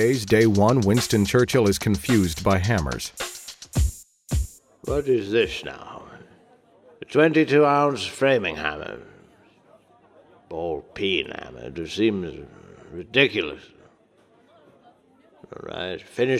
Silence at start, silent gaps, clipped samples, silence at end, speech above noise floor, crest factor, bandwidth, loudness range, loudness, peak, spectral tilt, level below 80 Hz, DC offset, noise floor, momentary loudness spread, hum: 0 s; none; under 0.1%; 0 s; 36 dB; 22 dB; 16 kHz; 7 LU; -22 LUFS; -2 dBFS; -5.5 dB/octave; -38 dBFS; under 0.1%; -58 dBFS; 19 LU; none